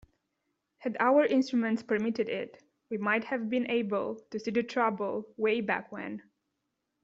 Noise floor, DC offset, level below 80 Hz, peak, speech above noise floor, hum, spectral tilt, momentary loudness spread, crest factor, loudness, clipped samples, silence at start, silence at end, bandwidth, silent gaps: -82 dBFS; under 0.1%; -74 dBFS; -12 dBFS; 53 dB; none; -4 dB/octave; 14 LU; 18 dB; -30 LUFS; under 0.1%; 0.8 s; 0.8 s; 7.6 kHz; none